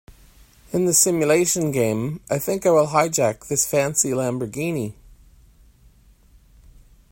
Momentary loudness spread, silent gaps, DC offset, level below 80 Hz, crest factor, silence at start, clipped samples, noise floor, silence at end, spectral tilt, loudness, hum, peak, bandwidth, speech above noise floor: 10 LU; none; under 0.1%; -52 dBFS; 20 dB; 0.7 s; under 0.1%; -53 dBFS; 2.2 s; -4 dB/octave; -20 LUFS; none; -2 dBFS; 16.5 kHz; 32 dB